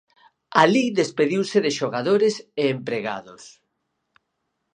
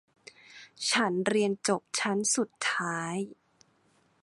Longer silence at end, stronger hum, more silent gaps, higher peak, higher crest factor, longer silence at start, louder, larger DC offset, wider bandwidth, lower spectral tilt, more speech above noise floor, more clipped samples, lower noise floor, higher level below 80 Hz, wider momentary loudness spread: first, 1.25 s vs 0.9 s; neither; neither; first, 0 dBFS vs -12 dBFS; about the same, 22 dB vs 20 dB; about the same, 0.5 s vs 0.5 s; first, -21 LUFS vs -29 LUFS; neither; second, 10 kHz vs 11.5 kHz; first, -5 dB/octave vs -3 dB/octave; first, 55 dB vs 38 dB; neither; first, -76 dBFS vs -68 dBFS; first, -72 dBFS vs -78 dBFS; second, 10 LU vs 15 LU